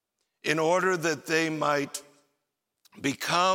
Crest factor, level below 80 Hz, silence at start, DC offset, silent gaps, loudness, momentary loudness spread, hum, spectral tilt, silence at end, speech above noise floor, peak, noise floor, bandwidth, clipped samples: 18 dB; -78 dBFS; 0.45 s; under 0.1%; none; -27 LUFS; 10 LU; none; -3.5 dB/octave; 0 s; 56 dB; -10 dBFS; -82 dBFS; 16.5 kHz; under 0.1%